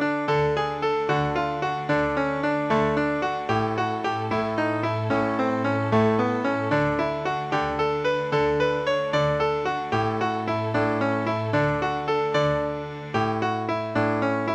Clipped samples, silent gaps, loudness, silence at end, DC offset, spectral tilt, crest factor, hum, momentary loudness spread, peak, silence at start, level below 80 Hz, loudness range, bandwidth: under 0.1%; none; -24 LUFS; 0 s; under 0.1%; -7 dB/octave; 14 dB; none; 3 LU; -10 dBFS; 0 s; -50 dBFS; 1 LU; 9 kHz